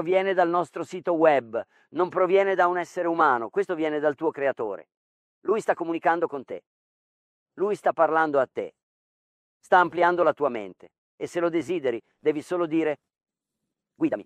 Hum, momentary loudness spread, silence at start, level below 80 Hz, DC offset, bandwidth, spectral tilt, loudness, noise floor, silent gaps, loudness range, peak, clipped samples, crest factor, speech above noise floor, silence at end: none; 14 LU; 0 s; -76 dBFS; under 0.1%; 10.5 kHz; -6 dB/octave; -25 LUFS; -84 dBFS; 4.97-5.42 s, 6.67-7.46 s, 8.83-9.60 s, 10.98-11.18 s; 5 LU; -6 dBFS; under 0.1%; 20 dB; 60 dB; 0.05 s